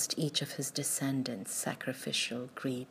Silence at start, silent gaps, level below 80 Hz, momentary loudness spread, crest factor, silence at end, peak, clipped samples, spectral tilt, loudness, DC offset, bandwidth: 0 s; none; -82 dBFS; 6 LU; 18 dB; 0 s; -16 dBFS; under 0.1%; -3 dB/octave; -34 LUFS; under 0.1%; 15.5 kHz